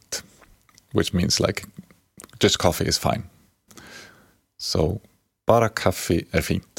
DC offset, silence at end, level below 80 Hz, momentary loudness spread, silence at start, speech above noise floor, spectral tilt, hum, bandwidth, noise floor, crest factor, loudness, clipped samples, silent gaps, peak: under 0.1%; 0.2 s; -44 dBFS; 23 LU; 0.1 s; 34 dB; -4.5 dB/octave; none; 17 kHz; -56 dBFS; 22 dB; -23 LUFS; under 0.1%; none; -2 dBFS